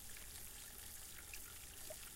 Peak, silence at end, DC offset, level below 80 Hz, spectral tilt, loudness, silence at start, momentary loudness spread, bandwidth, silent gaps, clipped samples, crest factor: -34 dBFS; 0 s; under 0.1%; -62 dBFS; -1 dB/octave; -51 LUFS; 0 s; 1 LU; 16.5 kHz; none; under 0.1%; 20 dB